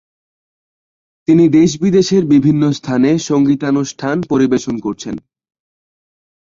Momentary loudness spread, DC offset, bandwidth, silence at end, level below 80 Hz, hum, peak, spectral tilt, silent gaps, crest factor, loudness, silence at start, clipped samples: 12 LU; under 0.1%; 7.6 kHz; 1.3 s; -52 dBFS; none; -2 dBFS; -6.5 dB/octave; none; 14 dB; -14 LUFS; 1.3 s; under 0.1%